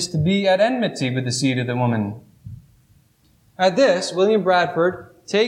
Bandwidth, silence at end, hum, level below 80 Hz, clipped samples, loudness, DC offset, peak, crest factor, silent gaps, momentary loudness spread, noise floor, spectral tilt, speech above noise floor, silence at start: 13 kHz; 0 s; none; -58 dBFS; under 0.1%; -19 LUFS; under 0.1%; -6 dBFS; 14 dB; none; 7 LU; -58 dBFS; -5 dB/octave; 39 dB; 0 s